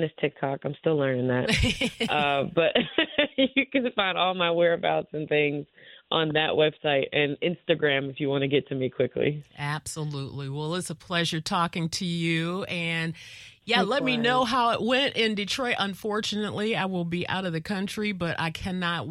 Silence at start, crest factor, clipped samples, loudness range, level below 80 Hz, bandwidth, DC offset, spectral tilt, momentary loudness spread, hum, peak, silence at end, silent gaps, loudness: 0 s; 22 dB; under 0.1%; 4 LU; -50 dBFS; 15 kHz; under 0.1%; -5 dB/octave; 8 LU; none; -6 dBFS; 0 s; none; -26 LUFS